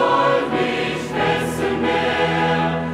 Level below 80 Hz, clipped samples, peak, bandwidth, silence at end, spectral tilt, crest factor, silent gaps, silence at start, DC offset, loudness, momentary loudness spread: -46 dBFS; under 0.1%; -6 dBFS; 15.5 kHz; 0 s; -5.5 dB/octave; 14 dB; none; 0 s; under 0.1%; -19 LUFS; 4 LU